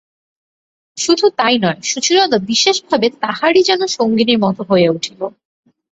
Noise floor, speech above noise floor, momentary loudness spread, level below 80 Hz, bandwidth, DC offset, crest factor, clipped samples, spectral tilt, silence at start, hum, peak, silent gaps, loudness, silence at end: under -90 dBFS; over 76 dB; 9 LU; -58 dBFS; 8.2 kHz; under 0.1%; 14 dB; under 0.1%; -3.5 dB/octave; 0.95 s; none; -2 dBFS; none; -14 LUFS; 0.65 s